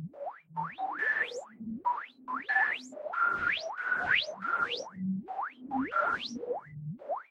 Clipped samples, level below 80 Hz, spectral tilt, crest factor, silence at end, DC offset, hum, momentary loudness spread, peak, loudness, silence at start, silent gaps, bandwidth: under 0.1%; -70 dBFS; -4.5 dB/octave; 18 dB; 0.1 s; under 0.1%; none; 11 LU; -16 dBFS; -32 LUFS; 0 s; none; 10 kHz